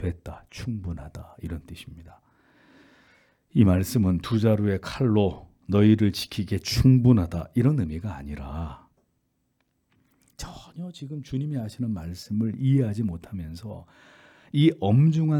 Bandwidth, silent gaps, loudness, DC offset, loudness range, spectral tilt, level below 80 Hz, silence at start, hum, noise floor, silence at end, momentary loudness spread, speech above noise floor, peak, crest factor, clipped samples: 18 kHz; none; -24 LUFS; under 0.1%; 15 LU; -7.5 dB/octave; -46 dBFS; 0 s; none; -73 dBFS; 0 s; 20 LU; 49 dB; -6 dBFS; 20 dB; under 0.1%